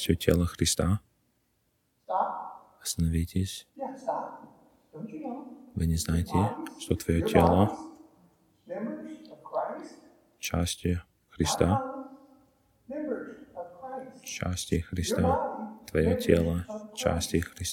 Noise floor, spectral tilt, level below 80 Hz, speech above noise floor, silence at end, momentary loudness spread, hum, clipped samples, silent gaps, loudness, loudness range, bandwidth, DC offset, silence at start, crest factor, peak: -73 dBFS; -5.5 dB/octave; -44 dBFS; 46 dB; 0 s; 17 LU; none; under 0.1%; none; -29 LUFS; 7 LU; 18 kHz; under 0.1%; 0 s; 24 dB; -6 dBFS